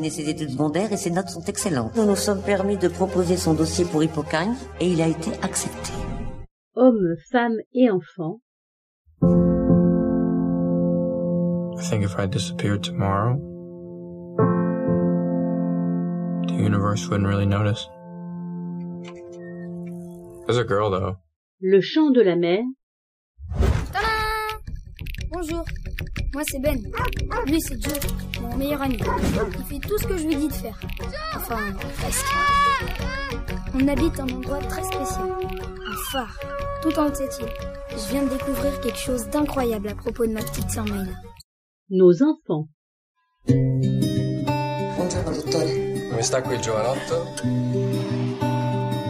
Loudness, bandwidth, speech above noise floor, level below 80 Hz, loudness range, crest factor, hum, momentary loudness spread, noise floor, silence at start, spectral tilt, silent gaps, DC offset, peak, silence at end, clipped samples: -23 LUFS; 15.5 kHz; over 68 dB; -36 dBFS; 5 LU; 20 dB; none; 14 LU; under -90 dBFS; 0 s; -6 dB/octave; 6.51-6.71 s, 7.66-7.71 s, 8.42-9.05 s, 21.36-21.58 s, 22.83-23.35 s, 41.44-41.86 s, 42.74-43.15 s; under 0.1%; -4 dBFS; 0 s; under 0.1%